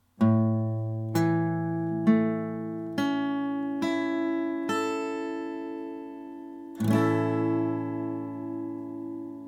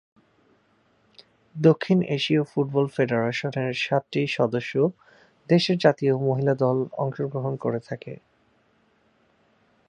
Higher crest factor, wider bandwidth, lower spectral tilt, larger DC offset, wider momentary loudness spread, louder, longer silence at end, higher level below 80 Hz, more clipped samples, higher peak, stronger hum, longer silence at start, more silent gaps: about the same, 18 dB vs 22 dB; first, 17 kHz vs 10 kHz; about the same, -7.5 dB/octave vs -7 dB/octave; neither; first, 13 LU vs 8 LU; second, -28 LUFS vs -24 LUFS; second, 0 s vs 1.75 s; about the same, -72 dBFS vs -68 dBFS; neither; second, -10 dBFS vs -4 dBFS; neither; second, 0.2 s vs 1.55 s; neither